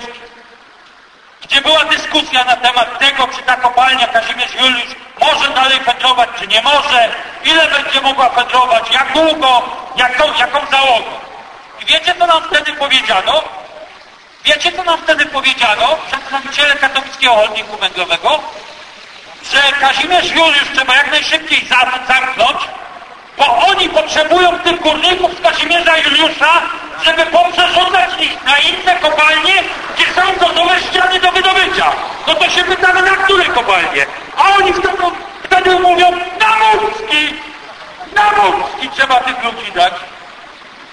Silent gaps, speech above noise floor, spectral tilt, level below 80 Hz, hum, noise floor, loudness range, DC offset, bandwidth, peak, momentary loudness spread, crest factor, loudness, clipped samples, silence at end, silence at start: none; 30 dB; -1.5 dB/octave; -44 dBFS; none; -42 dBFS; 3 LU; under 0.1%; 11 kHz; 0 dBFS; 8 LU; 12 dB; -10 LUFS; under 0.1%; 0 s; 0 s